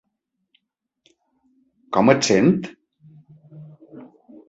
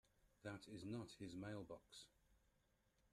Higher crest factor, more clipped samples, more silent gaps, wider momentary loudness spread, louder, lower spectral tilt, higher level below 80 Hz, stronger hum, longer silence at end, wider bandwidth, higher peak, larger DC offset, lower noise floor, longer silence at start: about the same, 22 dB vs 18 dB; neither; neither; first, 21 LU vs 10 LU; first, -18 LUFS vs -55 LUFS; about the same, -5 dB/octave vs -5.5 dB/octave; first, -62 dBFS vs -80 dBFS; neither; second, 0.45 s vs 0.75 s; second, 8.2 kHz vs 13 kHz; first, -2 dBFS vs -38 dBFS; neither; second, -78 dBFS vs -82 dBFS; first, 1.9 s vs 0.25 s